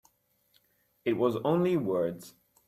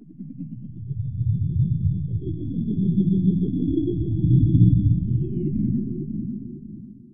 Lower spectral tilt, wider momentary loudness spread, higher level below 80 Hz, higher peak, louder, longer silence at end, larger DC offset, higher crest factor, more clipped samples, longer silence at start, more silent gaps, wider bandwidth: second, -7.5 dB/octave vs -20.5 dB/octave; second, 8 LU vs 19 LU; second, -70 dBFS vs -36 dBFS; second, -16 dBFS vs -4 dBFS; second, -29 LUFS vs -23 LUFS; first, 0.4 s vs 0 s; second, under 0.1% vs 1%; about the same, 16 dB vs 18 dB; neither; first, 1.05 s vs 0 s; neither; first, 14.5 kHz vs 3.7 kHz